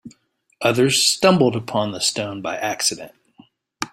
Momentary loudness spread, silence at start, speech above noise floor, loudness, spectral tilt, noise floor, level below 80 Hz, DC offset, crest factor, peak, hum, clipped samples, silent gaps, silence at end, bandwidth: 11 LU; 0.05 s; 39 dB; -19 LUFS; -3.5 dB/octave; -58 dBFS; -58 dBFS; under 0.1%; 20 dB; -2 dBFS; none; under 0.1%; none; 0.05 s; 16.5 kHz